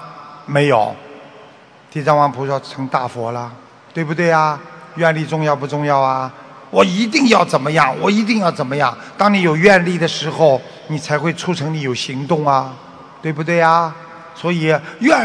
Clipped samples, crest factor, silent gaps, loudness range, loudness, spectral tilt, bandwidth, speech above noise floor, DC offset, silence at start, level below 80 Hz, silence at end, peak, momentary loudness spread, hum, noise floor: under 0.1%; 16 dB; none; 5 LU; -16 LUFS; -5.5 dB/octave; 11 kHz; 28 dB; under 0.1%; 0 s; -58 dBFS; 0 s; 0 dBFS; 14 LU; none; -43 dBFS